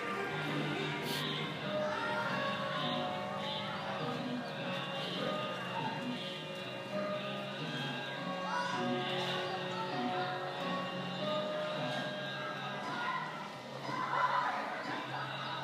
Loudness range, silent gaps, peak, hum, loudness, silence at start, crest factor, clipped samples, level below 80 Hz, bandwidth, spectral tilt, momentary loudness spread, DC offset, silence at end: 2 LU; none; -20 dBFS; none; -37 LUFS; 0 s; 18 dB; under 0.1%; -82 dBFS; 15.5 kHz; -5 dB/octave; 4 LU; under 0.1%; 0 s